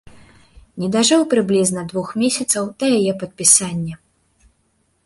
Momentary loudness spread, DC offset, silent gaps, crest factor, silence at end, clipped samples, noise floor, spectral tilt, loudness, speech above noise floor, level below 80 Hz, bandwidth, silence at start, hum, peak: 14 LU; under 0.1%; none; 20 dB; 1.1 s; under 0.1%; -64 dBFS; -3.5 dB/octave; -17 LUFS; 47 dB; -54 dBFS; 12 kHz; 0.75 s; none; 0 dBFS